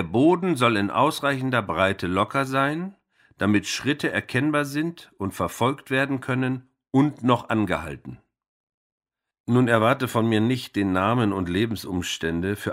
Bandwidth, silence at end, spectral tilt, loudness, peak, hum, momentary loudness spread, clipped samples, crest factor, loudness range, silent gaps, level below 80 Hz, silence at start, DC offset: 16 kHz; 0 s; -6 dB/octave; -23 LUFS; -4 dBFS; none; 9 LU; under 0.1%; 20 dB; 3 LU; 8.48-8.67 s, 8.74-8.98 s, 9.40-9.44 s; -54 dBFS; 0 s; under 0.1%